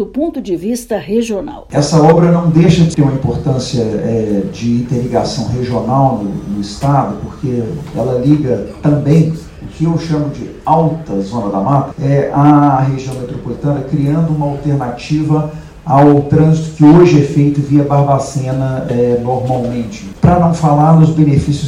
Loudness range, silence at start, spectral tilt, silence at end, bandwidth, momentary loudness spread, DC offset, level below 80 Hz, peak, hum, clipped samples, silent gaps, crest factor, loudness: 5 LU; 0 s; -8 dB/octave; 0 s; 11.5 kHz; 11 LU; under 0.1%; -36 dBFS; 0 dBFS; none; 0.8%; none; 12 dB; -12 LUFS